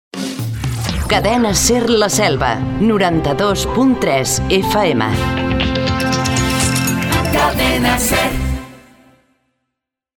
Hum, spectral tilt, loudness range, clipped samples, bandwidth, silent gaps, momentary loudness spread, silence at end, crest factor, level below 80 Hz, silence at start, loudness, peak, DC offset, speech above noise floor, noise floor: none; -4 dB/octave; 2 LU; under 0.1%; 18 kHz; none; 7 LU; 1.4 s; 16 dB; -28 dBFS; 0.15 s; -15 LUFS; 0 dBFS; under 0.1%; 65 dB; -79 dBFS